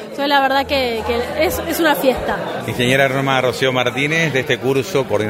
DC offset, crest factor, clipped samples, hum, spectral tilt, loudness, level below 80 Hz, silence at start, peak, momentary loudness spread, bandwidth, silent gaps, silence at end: under 0.1%; 16 dB; under 0.1%; none; -4.5 dB/octave; -17 LUFS; -42 dBFS; 0 s; 0 dBFS; 6 LU; 16.5 kHz; none; 0 s